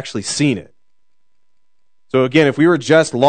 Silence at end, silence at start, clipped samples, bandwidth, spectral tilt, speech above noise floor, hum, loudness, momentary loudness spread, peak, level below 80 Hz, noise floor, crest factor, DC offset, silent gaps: 0 s; 0 s; under 0.1%; 9.4 kHz; -5 dB/octave; 62 dB; none; -15 LUFS; 9 LU; 0 dBFS; -62 dBFS; -76 dBFS; 16 dB; 0.4%; none